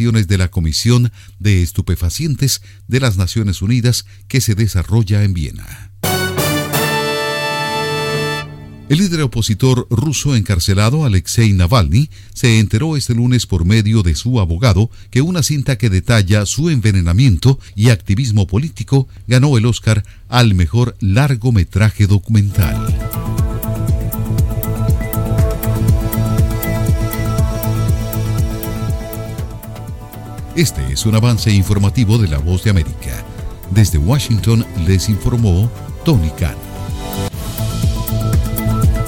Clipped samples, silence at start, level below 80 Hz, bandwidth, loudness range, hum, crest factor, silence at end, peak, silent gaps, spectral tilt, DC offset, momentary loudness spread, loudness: under 0.1%; 0 s; -26 dBFS; 17 kHz; 4 LU; none; 14 dB; 0 s; 0 dBFS; none; -5.5 dB/octave; under 0.1%; 9 LU; -15 LUFS